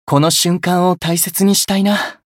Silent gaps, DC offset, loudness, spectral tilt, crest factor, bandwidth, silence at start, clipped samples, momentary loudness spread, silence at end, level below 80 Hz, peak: none; under 0.1%; -14 LUFS; -4 dB/octave; 14 dB; 17 kHz; 0.05 s; under 0.1%; 3 LU; 0.2 s; -52 dBFS; 0 dBFS